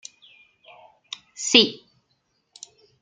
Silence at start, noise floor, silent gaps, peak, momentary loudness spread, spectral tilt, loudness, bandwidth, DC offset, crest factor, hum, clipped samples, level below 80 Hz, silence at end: 1.4 s; -71 dBFS; none; 0 dBFS; 28 LU; -1.5 dB/octave; -18 LUFS; 12.5 kHz; under 0.1%; 26 dB; none; under 0.1%; -72 dBFS; 1.25 s